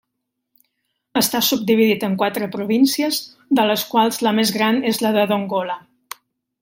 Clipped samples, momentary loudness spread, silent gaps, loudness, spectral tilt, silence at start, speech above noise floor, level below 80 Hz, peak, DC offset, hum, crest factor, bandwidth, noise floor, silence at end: under 0.1%; 11 LU; none; -18 LUFS; -4 dB/octave; 1.15 s; 59 dB; -66 dBFS; -2 dBFS; under 0.1%; none; 16 dB; 16.5 kHz; -78 dBFS; 0.85 s